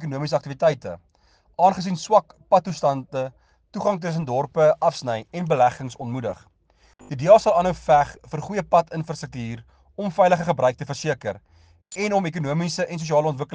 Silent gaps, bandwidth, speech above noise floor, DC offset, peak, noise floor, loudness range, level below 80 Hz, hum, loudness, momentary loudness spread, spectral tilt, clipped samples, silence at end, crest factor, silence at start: none; 9.6 kHz; 38 dB; under 0.1%; -2 dBFS; -60 dBFS; 3 LU; -54 dBFS; none; -22 LUFS; 15 LU; -6 dB/octave; under 0.1%; 0 s; 20 dB; 0 s